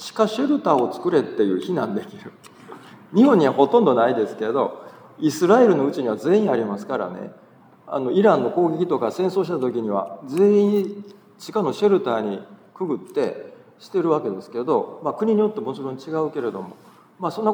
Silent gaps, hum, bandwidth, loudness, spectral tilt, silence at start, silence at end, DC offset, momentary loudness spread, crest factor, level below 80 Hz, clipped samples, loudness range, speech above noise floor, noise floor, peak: none; none; over 20 kHz; -21 LUFS; -7 dB/octave; 0 s; 0 s; under 0.1%; 14 LU; 18 dB; -80 dBFS; under 0.1%; 5 LU; 22 dB; -42 dBFS; -2 dBFS